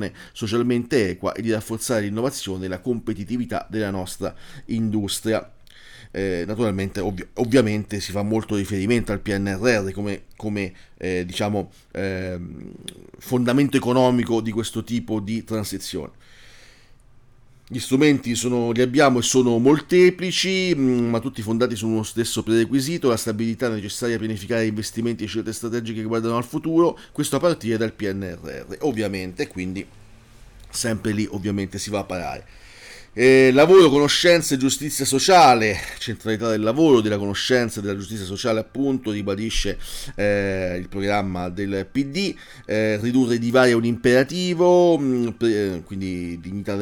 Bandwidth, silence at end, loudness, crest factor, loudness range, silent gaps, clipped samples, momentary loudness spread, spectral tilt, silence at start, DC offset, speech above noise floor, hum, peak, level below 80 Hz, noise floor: 19 kHz; 0 s; -21 LUFS; 16 dB; 10 LU; none; under 0.1%; 14 LU; -5 dB/octave; 0 s; under 0.1%; 29 dB; none; -6 dBFS; -44 dBFS; -50 dBFS